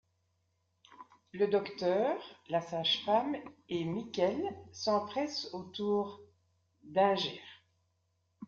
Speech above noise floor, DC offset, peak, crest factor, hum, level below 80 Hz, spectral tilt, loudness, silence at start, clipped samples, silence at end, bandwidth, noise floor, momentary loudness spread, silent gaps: 45 dB; under 0.1%; -14 dBFS; 20 dB; none; -78 dBFS; -5 dB/octave; -34 LUFS; 0.9 s; under 0.1%; 0 s; 7.2 kHz; -78 dBFS; 11 LU; none